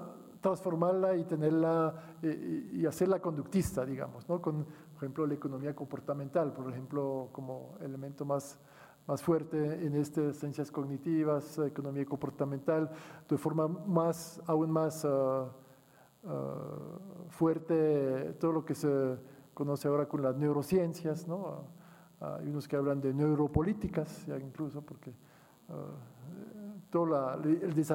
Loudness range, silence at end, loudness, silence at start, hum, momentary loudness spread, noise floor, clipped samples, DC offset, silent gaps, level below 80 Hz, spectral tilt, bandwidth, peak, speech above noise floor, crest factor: 5 LU; 0 s; -34 LUFS; 0 s; none; 15 LU; -62 dBFS; under 0.1%; under 0.1%; none; -62 dBFS; -8 dB/octave; 17 kHz; -16 dBFS; 29 dB; 18 dB